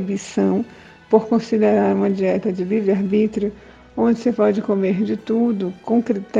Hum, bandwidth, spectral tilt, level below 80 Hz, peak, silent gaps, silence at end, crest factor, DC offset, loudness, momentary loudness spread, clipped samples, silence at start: none; 7.8 kHz; -7.5 dB/octave; -56 dBFS; 0 dBFS; none; 0 s; 18 dB; under 0.1%; -19 LUFS; 7 LU; under 0.1%; 0 s